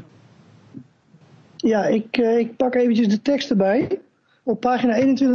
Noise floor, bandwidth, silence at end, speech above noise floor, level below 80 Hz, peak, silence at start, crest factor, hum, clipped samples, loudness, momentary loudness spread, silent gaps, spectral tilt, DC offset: -53 dBFS; 7 kHz; 0 s; 34 dB; -62 dBFS; -4 dBFS; 0.75 s; 16 dB; none; under 0.1%; -20 LUFS; 8 LU; none; -6.5 dB/octave; under 0.1%